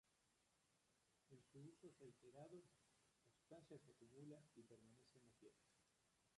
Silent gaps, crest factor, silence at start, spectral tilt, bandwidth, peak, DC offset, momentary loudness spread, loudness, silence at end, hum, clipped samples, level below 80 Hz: none; 18 dB; 0.05 s; -6 dB/octave; 11 kHz; -50 dBFS; under 0.1%; 5 LU; -66 LUFS; 0 s; none; under 0.1%; under -90 dBFS